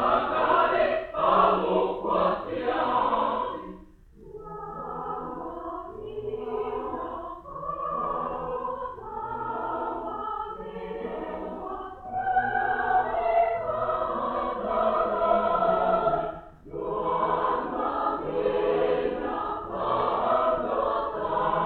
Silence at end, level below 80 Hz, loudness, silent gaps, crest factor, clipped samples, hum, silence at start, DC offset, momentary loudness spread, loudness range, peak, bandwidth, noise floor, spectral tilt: 0 s; -50 dBFS; -27 LUFS; none; 20 dB; under 0.1%; none; 0 s; under 0.1%; 13 LU; 8 LU; -8 dBFS; 4.7 kHz; -50 dBFS; -8 dB/octave